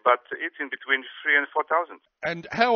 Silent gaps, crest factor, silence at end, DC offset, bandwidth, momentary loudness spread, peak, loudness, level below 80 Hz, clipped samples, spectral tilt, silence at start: none; 20 dB; 0 s; under 0.1%; 6.6 kHz; 11 LU; -4 dBFS; -25 LUFS; -70 dBFS; under 0.1%; -0.5 dB/octave; 0.05 s